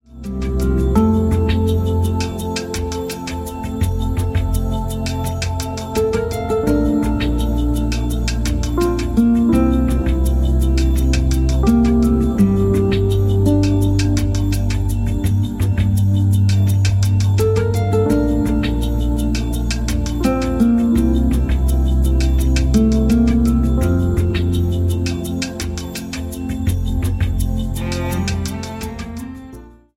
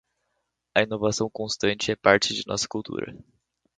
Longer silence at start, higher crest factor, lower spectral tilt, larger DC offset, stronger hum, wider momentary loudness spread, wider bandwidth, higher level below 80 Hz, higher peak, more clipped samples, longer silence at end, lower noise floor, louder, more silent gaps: second, 0.1 s vs 0.75 s; second, 14 dB vs 26 dB; first, -7 dB/octave vs -3.5 dB/octave; neither; neither; second, 9 LU vs 13 LU; first, 16 kHz vs 9.6 kHz; first, -22 dBFS vs -58 dBFS; about the same, -2 dBFS vs -2 dBFS; neither; second, 0.25 s vs 0.6 s; second, -38 dBFS vs -78 dBFS; first, -18 LUFS vs -25 LUFS; neither